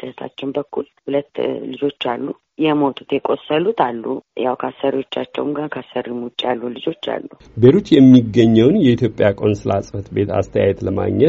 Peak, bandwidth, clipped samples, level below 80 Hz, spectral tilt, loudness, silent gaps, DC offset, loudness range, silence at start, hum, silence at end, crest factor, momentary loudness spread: 0 dBFS; 7.4 kHz; under 0.1%; -50 dBFS; -6 dB/octave; -17 LUFS; none; under 0.1%; 8 LU; 0 s; none; 0 s; 16 dB; 14 LU